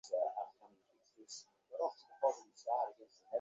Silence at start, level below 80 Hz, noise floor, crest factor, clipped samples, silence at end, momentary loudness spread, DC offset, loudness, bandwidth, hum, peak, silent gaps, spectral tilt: 0.05 s; under -90 dBFS; -73 dBFS; 20 dB; under 0.1%; 0 s; 14 LU; under 0.1%; -41 LUFS; 8 kHz; none; -22 dBFS; none; -0.5 dB/octave